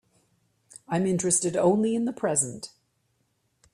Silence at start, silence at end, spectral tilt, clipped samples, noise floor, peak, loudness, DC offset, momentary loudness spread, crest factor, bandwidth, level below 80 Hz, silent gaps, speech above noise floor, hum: 0.9 s; 1.05 s; -4.5 dB/octave; under 0.1%; -72 dBFS; -10 dBFS; -25 LUFS; under 0.1%; 8 LU; 18 dB; 15.5 kHz; -66 dBFS; none; 47 dB; none